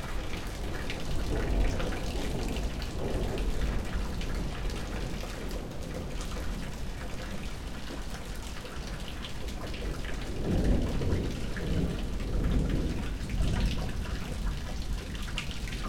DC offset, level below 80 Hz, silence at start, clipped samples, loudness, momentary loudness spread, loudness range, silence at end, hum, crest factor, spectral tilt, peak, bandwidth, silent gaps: under 0.1%; -34 dBFS; 0 s; under 0.1%; -35 LUFS; 9 LU; 7 LU; 0 s; none; 16 dB; -5.5 dB/octave; -16 dBFS; 16.5 kHz; none